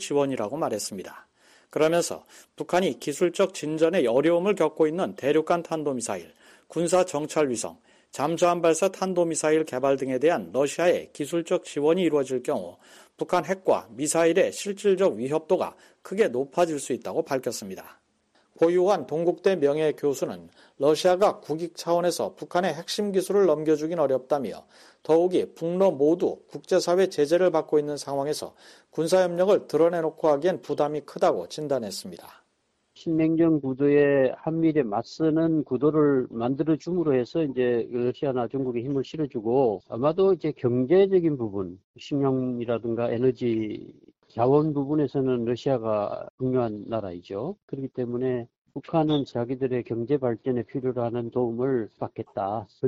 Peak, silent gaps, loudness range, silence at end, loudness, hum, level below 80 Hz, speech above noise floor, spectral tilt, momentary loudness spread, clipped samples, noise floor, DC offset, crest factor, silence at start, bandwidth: -8 dBFS; 41.84-41.94 s, 46.30-46.38 s, 47.63-47.68 s, 48.58-48.65 s; 4 LU; 0 s; -25 LUFS; none; -64 dBFS; 48 dB; -5.5 dB/octave; 11 LU; under 0.1%; -72 dBFS; under 0.1%; 18 dB; 0 s; 14.5 kHz